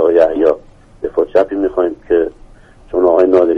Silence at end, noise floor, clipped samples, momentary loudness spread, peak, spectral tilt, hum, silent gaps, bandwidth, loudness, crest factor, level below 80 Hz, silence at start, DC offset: 0 s; -40 dBFS; under 0.1%; 11 LU; 0 dBFS; -7.5 dB/octave; none; none; 6.2 kHz; -14 LUFS; 14 dB; -42 dBFS; 0 s; under 0.1%